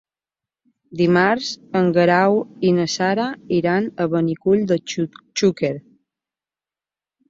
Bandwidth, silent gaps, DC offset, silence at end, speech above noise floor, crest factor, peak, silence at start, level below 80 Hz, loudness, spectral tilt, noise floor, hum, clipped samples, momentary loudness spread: 7.8 kHz; none; under 0.1%; 1.5 s; over 71 dB; 18 dB; -2 dBFS; 0.9 s; -60 dBFS; -19 LUFS; -5.5 dB/octave; under -90 dBFS; none; under 0.1%; 9 LU